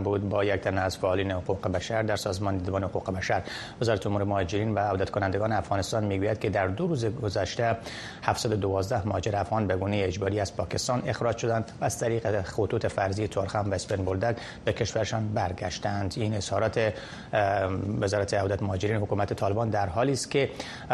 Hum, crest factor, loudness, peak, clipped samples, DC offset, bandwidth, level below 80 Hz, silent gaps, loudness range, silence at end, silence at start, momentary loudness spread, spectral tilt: none; 22 dB; -28 LUFS; -6 dBFS; under 0.1%; under 0.1%; 12.5 kHz; -52 dBFS; none; 1 LU; 0 s; 0 s; 4 LU; -5.5 dB/octave